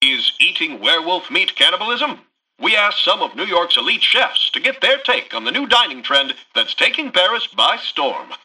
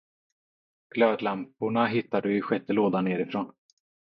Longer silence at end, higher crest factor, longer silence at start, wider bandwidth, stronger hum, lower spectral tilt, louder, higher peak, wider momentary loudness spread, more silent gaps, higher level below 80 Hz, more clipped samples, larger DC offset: second, 0.1 s vs 0.55 s; about the same, 16 dB vs 20 dB; second, 0 s vs 0.95 s; first, 12 kHz vs 5.8 kHz; neither; second, -1 dB/octave vs -9 dB/octave; first, -15 LUFS vs -27 LUFS; first, -2 dBFS vs -8 dBFS; about the same, 7 LU vs 8 LU; neither; first, -66 dBFS vs -74 dBFS; neither; neither